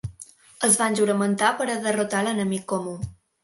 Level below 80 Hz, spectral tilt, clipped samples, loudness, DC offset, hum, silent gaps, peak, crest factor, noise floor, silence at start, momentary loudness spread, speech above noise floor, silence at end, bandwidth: -54 dBFS; -3.5 dB/octave; under 0.1%; -23 LUFS; under 0.1%; none; none; -6 dBFS; 18 dB; -48 dBFS; 0.05 s; 15 LU; 25 dB; 0.3 s; 12 kHz